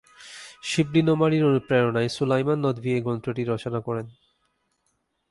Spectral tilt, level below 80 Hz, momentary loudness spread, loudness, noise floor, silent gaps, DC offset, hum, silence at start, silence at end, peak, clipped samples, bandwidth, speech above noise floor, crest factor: -6.5 dB/octave; -60 dBFS; 15 LU; -24 LUFS; -73 dBFS; none; under 0.1%; none; 0.2 s; 1.2 s; -8 dBFS; under 0.1%; 11.5 kHz; 50 dB; 18 dB